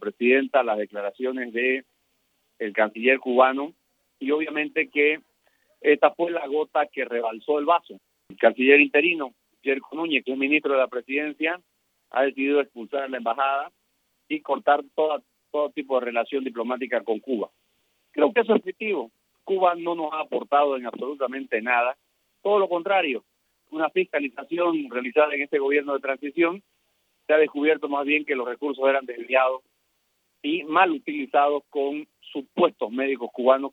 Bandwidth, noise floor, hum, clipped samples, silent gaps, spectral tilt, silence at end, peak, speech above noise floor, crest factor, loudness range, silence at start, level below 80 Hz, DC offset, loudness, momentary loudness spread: 4.1 kHz; -72 dBFS; none; under 0.1%; none; -6.5 dB/octave; 0.05 s; -2 dBFS; 48 dB; 22 dB; 5 LU; 0 s; -86 dBFS; under 0.1%; -24 LUFS; 10 LU